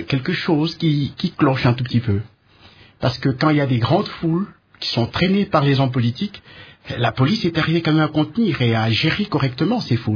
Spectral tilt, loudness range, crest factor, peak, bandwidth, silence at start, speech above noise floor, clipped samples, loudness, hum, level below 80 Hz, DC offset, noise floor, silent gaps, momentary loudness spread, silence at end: -7.5 dB/octave; 2 LU; 18 dB; -2 dBFS; 5.4 kHz; 0 s; 30 dB; under 0.1%; -19 LUFS; none; -48 dBFS; under 0.1%; -48 dBFS; none; 7 LU; 0 s